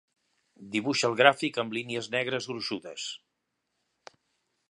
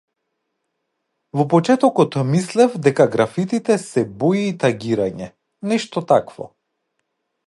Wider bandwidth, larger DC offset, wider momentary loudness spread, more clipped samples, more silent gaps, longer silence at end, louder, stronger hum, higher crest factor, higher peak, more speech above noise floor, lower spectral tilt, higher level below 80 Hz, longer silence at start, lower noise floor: about the same, 11.5 kHz vs 11.5 kHz; neither; about the same, 15 LU vs 14 LU; neither; neither; first, 1.55 s vs 1 s; second, -28 LUFS vs -18 LUFS; neither; first, 28 dB vs 18 dB; about the same, -2 dBFS vs 0 dBFS; second, 52 dB vs 57 dB; second, -3.5 dB/octave vs -6.5 dB/octave; second, -78 dBFS vs -60 dBFS; second, 0.6 s vs 1.35 s; first, -81 dBFS vs -75 dBFS